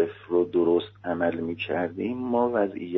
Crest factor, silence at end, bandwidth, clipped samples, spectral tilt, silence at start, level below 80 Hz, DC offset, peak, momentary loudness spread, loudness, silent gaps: 14 dB; 0 s; 5.6 kHz; under 0.1%; -5 dB/octave; 0 s; -66 dBFS; under 0.1%; -12 dBFS; 7 LU; -26 LUFS; none